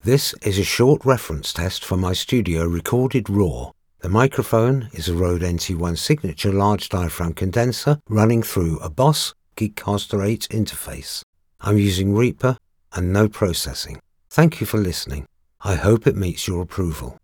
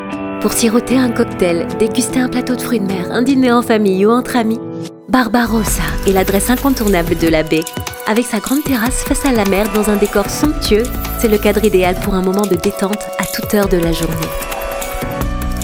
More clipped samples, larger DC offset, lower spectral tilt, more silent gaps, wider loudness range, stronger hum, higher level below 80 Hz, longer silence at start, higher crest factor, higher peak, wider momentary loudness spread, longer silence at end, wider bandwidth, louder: neither; neither; about the same, -5.5 dB/octave vs -5 dB/octave; first, 11.23-11.33 s vs none; about the same, 2 LU vs 1 LU; neither; second, -38 dBFS vs -26 dBFS; about the same, 0.05 s vs 0 s; first, 20 dB vs 14 dB; about the same, 0 dBFS vs 0 dBFS; about the same, 10 LU vs 8 LU; about the same, 0.1 s vs 0 s; about the same, 20 kHz vs over 20 kHz; second, -20 LUFS vs -15 LUFS